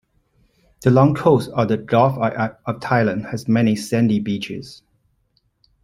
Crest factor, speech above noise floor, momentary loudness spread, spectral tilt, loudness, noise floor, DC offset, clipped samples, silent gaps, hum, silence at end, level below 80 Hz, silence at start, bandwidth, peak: 18 dB; 47 dB; 11 LU; -7.5 dB/octave; -19 LUFS; -65 dBFS; under 0.1%; under 0.1%; none; none; 1.1 s; -54 dBFS; 0.8 s; 15.5 kHz; -2 dBFS